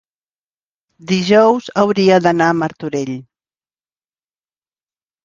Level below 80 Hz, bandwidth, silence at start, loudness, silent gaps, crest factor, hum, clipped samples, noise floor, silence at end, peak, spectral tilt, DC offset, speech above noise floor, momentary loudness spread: -58 dBFS; 7.4 kHz; 1.05 s; -14 LUFS; none; 18 dB; none; under 0.1%; under -90 dBFS; 2.05 s; 0 dBFS; -6 dB/octave; under 0.1%; over 76 dB; 11 LU